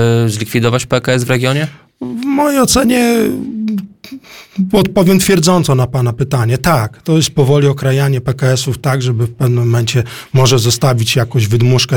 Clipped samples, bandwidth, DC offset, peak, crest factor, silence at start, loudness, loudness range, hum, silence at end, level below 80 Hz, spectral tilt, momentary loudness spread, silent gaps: under 0.1%; 19 kHz; under 0.1%; 0 dBFS; 12 dB; 0 s; -13 LUFS; 2 LU; none; 0 s; -38 dBFS; -5.5 dB/octave; 9 LU; none